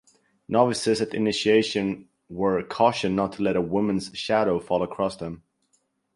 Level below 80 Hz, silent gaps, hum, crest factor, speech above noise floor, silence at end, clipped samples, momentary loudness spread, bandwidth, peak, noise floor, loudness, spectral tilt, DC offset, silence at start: -56 dBFS; none; none; 20 dB; 47 dB; 0.8 s; under 0.1%; 9 LU; 11.5 kHz; -6 dBFS; -70 dBFS; -24 LUFS; -5 dB/octave; under 0.1%; 0.5 s